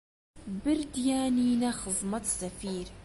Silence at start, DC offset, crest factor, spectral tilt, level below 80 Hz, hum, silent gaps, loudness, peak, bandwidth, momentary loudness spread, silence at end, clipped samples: 0.35 s; under 0.1%; 12 dB; -4 dB/octave; -52 dBFS; none; none; -30 LUFS; -18 dBFS; 11.5 kHz; 10 LU; 0 s; under 0.1%